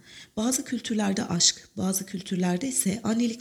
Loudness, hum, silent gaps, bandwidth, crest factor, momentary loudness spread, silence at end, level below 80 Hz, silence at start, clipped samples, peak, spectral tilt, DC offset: -26 LUFS; none; none; 18 kHz; 22 dB; 9 LU; 0 s; -62 dBFS; 0.05 s; under 0.1%; -6 dBFS; -3.5 dB/octave; under 0.1%